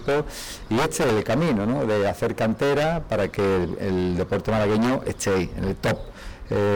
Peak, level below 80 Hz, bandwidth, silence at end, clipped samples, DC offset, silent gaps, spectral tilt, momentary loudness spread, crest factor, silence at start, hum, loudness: -18 dBFS; -42 dBFS; over 20 kHz; 0 s; under 0.1%; 0.3%; none; -6 dB/octave; 6 LU; 6 dB; 0 s; none; -24 LUFS